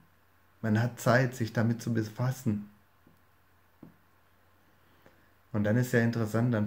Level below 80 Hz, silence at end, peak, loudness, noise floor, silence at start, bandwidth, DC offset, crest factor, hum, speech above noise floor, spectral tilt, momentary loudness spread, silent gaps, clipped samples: -70 dBFS; 0 s; -10 dBFS; -30 LUFS; -66 dBFS; 0.65 s; 16 kHz; under 0.1%; 22 dB; none; 38 dB; -7 dB/octave; 10 LU; none; under 0.1%